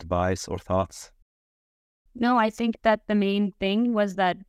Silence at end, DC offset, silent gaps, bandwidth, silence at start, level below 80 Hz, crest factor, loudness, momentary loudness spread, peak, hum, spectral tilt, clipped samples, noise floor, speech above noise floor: 0.05 s; under 0.1%; 1.22-2.05 s; 13 kHz; 0 s; -54 dBFS; 18 dB; -25 LUFS; 5 LU; -8 dBFS; none; -6 dB/octave; under 0.1%; under -90 dBFS; over 66 dB